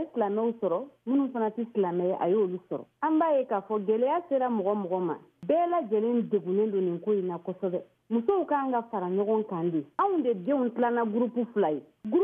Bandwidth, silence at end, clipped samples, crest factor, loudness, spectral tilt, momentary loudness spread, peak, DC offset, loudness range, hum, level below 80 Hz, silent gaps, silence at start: 3.7 kHz; 0 s; under 0.1%; 14 dB; -28 LUFS; -10.5 dB/octave; 6 LU; -14 dBFS; under 0.1%; 1 LU; none; -80 dBFS; none; 0 s